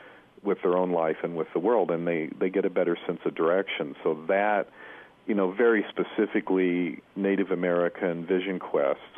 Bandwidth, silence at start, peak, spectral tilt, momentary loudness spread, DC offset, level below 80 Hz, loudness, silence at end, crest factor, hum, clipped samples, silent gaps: 3.8 kHz; 0 s; -12 dBFS; -9 dB/octave; 7 LU; under 0.1%; -74 dBFS; -27 LUFS; 0 s; 14 dB; none; under 0.1%; none